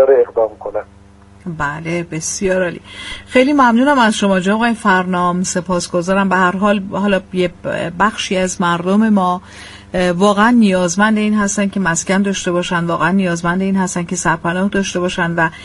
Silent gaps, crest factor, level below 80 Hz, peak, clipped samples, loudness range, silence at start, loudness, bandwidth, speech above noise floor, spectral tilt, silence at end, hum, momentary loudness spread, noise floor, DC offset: none; 14 dB; -42 dBFS; 0 dBFS; under 0.1%; 3 LU; 0 s; -15 LUFS; 11.5 kHz; 28 dB; -5 dB/octave; 0 s; none; 10 LU; -42 dBFS; under 0.1%